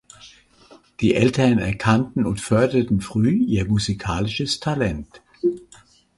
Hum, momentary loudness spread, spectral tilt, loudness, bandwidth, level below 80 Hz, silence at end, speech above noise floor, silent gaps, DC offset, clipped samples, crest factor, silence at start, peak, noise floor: none; 7 LU; -6 dB/octave; -21 LUFS; 11.5 kHz; -42 dBFS; 0.6 s; 32 dB; none; under 0.1%; under 0.1%; 18 dB; 0.25 s; -2 dBFS; -52 dBFS